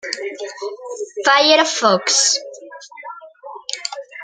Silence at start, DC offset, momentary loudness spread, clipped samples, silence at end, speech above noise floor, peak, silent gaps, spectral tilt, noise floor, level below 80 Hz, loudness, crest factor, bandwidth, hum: 0.05 s; under 0.1%; 23 LU; under 0.1%; 0 s; 21 dB; 0 dBFS; none; -0.5 dB/octave; -37 dBFS; -76 dBFS; -15 LUFS; 18 dB; 11 kHz; none